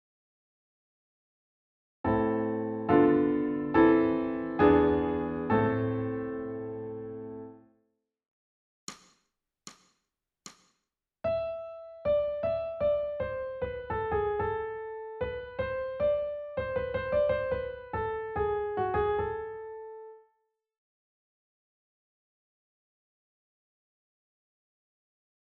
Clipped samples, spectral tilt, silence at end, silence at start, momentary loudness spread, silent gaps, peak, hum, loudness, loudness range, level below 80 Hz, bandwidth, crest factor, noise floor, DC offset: under 0.1%; -6.5 dB/octave; 5.3 s; 2.05 s; 17 LU; 8.28-8.87 s; -10 dBFS; none; -30 LUFS; 15 LU; -52 dBFS; 8 kHz; 22 dB; -84 dBFS; under 0.1%